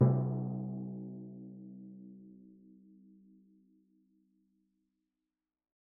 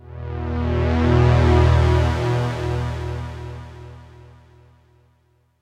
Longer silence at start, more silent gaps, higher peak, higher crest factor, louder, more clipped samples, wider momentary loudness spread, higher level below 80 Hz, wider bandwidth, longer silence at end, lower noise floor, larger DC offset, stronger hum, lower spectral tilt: about the same, 0 s vs 0.05 s; neither; second, -14 dBFS vs -4 dBFS; first, 26 dB vs 16 dB; second, -39 LUFS vs -19 LUFS; neither; first, 26 LU vs 20 LU; second, -80 dBFS vs -30 dBFS; second, 2 kHz vs 8.8 kHz; first, 3.45 s vs 1.55 s; first, under -90 dBFS vs -61 dBFS; neither; neither; first, -12 dB/octave vs -8 dB/octave